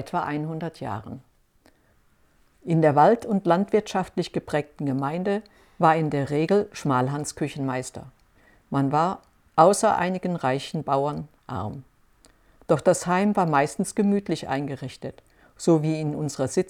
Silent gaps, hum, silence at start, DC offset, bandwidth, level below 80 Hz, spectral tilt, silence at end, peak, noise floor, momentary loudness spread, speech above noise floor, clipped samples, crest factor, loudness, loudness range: none; none; 0 s; under 0.1%; 15 kHz; -60 dBFS; -6 dB/octave; 0 s; -4 dBFS; -62 dBFS; 15 LU; 38 dB; under 0.1%; 22 dB; -24 LUFS; 3 LU